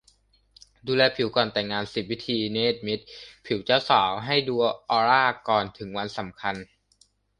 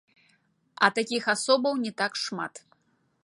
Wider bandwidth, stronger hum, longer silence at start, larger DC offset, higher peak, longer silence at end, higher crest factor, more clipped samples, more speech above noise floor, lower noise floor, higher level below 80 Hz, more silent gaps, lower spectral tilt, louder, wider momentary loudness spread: about the same, 11 kHz vs 11.5 kHz; neither; about the same, 0.85 s vs 0.8 s; neither; about the same, -4 dBFS vs -4 dBFS; about the same, 0.75 s vs 0.65 s; about the same, 22 dB vs 24 dB; neither; second, 39 dB vs 44 dB; second, -64 dBFS vs -70 dBFS; first, -60 dBFS vs -82 dBFS; neither; first, -5.5 dB/octave vs -2.5 dB/octave; about the same, -25 LUFS vs -26 LUFS; first, 12 LU vs 9 LU